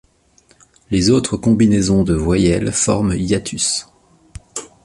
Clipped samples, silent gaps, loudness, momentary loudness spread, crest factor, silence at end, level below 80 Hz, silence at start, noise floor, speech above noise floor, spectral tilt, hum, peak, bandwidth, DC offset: under 0.1%; none; -16 LUFS; 9 LU; 16 dB; 0.2 s; -34 dBFS; 0.9 s; -54 dBFS; 39 dB; -5 dB/octave; none; -2 dBFS; 11.5 kHz; under 0.1%